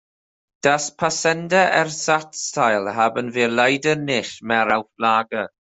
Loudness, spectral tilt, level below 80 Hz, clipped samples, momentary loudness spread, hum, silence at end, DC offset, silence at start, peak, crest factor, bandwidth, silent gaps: -20 LUFS; -3.5 dB/octave; -64 dBFS; under 0.1%; 5 LU; none; 0.25 s; under 0.1%; 0.65 s; -2 dBFS; 18 dB; 8.4 kHz; none